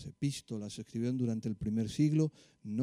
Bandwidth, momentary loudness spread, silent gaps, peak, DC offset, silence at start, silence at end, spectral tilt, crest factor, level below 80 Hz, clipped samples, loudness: 12 kHz; 11 LU; none; -18 dBFS; under 0.1%; 0 s; 0 s; -7 dB/octave; 16 dB; -62 dBFS; under 0.1%; -35 LUFS